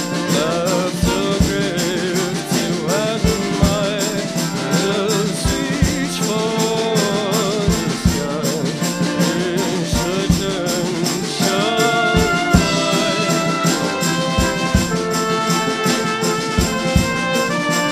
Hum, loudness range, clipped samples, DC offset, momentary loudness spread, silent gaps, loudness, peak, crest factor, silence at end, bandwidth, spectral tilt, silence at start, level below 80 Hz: none; 2 LU; under 0.1%; under 0.1%; 4 LU; none; -18 LUFS; -2 dBFS; 16 dB; 0 s; 16 kHz; -4.5 dB/octave; 0 s; -32 dBFS